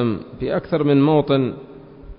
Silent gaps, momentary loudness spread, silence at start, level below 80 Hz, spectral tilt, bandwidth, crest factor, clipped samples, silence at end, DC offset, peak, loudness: none; 11 LU; 0 s; -46 dBFS; -12.5 dB/octave; 5.4 kHz; 14 dB; under 0.1%; 0.05 s; under 0.1%; -4 dBFS; -19 LUFS